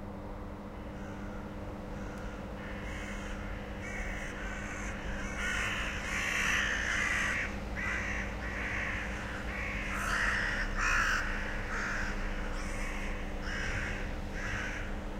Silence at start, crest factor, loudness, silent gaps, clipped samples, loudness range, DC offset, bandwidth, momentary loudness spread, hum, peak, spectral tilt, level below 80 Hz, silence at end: 0 s; 18 dB; -35 LUFS; none; under 0.1%; 9 LU; under 0.1%; 16 kHz; 13 LU; none; -16 dBFS; -3.5 dB/octave; -40 dBFS; 0 s